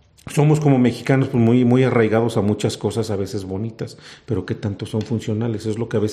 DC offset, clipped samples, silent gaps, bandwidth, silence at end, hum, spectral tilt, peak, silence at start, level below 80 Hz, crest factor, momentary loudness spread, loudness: under 0.1%; under 0.1%; none; 14 kHz; 0 s; none; -7 dB/octave; -2 dBFS; 0.25 s; -56 dBFS; 16 dB; 12 LU; -20 LUFS